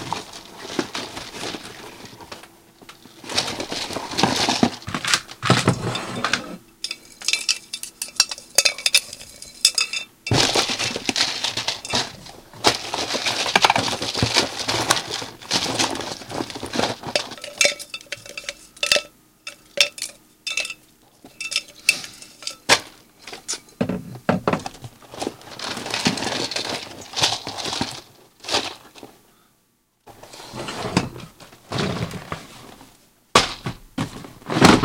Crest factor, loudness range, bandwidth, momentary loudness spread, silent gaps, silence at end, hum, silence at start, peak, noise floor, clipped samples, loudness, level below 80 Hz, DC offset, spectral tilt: 24 dB; 9 LU; 17 kHz; 19 LU; none; 0 s; none; 0 s; 0 dBFS; -65 dBFS; under 0.1%; -22 LUFS; -50 dBFS; under 0.1%; -2.5 dB/octave